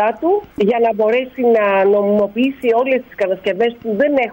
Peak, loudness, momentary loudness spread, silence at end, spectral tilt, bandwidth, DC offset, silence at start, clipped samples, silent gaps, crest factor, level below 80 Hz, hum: -4 dBFS; -16 LUFS; 5 LU; 0 s; -7.5 dB/octave; 16.5 kHz; under 0.1%; 0 s; under 0.1%; none; 10 dB; -54 dBFS; none